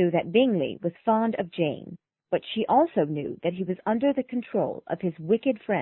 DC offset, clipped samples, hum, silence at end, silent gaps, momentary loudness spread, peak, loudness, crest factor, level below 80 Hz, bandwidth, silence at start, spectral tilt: under 0.1%; under 0.1%; none; 0 s; none; 8 LU; -8 dBFS; -26 LUFS; 18 dB; -66 dBFS; 4.2 kHz; 0 s; -11 dB/octave